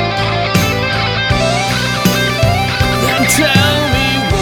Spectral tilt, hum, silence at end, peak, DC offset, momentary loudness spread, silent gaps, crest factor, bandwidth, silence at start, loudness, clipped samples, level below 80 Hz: -4 dB/octave; none; 0 s; 0 dBFS; under 0.1%; 4 LU; none; 12 dB; over 20 kHz; 0 s; -12 LUFS; under 0.1%; -28 dBFS